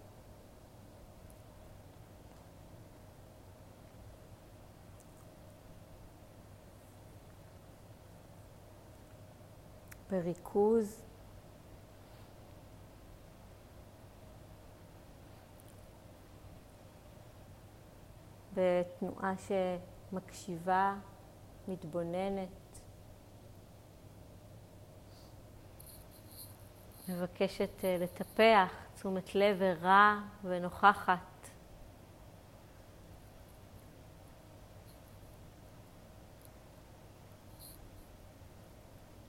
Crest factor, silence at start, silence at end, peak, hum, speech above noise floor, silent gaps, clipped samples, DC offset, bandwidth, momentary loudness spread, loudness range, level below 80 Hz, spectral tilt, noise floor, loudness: 28 dB; 0 s; 0.25 s; -12 dBFS; none; 24 dB; none; under 0.1%; under 0.1%; 16 kHz; 25 LU; 25 LU; -62 dBFS; -5.5 dB/octave; -56 dBFS; -33 LUFS